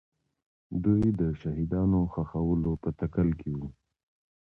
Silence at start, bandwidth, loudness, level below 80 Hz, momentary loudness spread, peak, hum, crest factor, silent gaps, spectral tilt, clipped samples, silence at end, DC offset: 0.7 s; 3.8 kHz; -29 LUFS; -44 dBFS; 11 LU; -12 dBFS; none; 16 dB; none; -11.5 dB/octave; under 0.1%; 0.9 s; under 0.1%